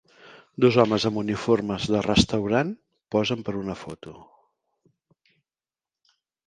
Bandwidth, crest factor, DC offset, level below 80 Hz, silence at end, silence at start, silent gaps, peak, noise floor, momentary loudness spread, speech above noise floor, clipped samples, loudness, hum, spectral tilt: 10 kHz; 22 dB; under 0.1%; -48 dBFS; 2.2 s; 0.25 s; none; -4 dBFS; under -90 dBFS; 20 LU; over 67 dB; under 0.1%; -24 LUFS; none; -5.5 dB/octave